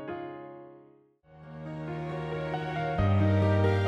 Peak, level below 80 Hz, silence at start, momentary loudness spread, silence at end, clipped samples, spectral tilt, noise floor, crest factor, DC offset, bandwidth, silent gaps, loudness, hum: -14 dBFS; -50 dBFS; 0 s; 20 LU; 0 s; under 0.1%; -8.5 dB/octave; -59 dBFS; 16 dB; under 0.1%; 6 kHz; none; -29 LUFS; none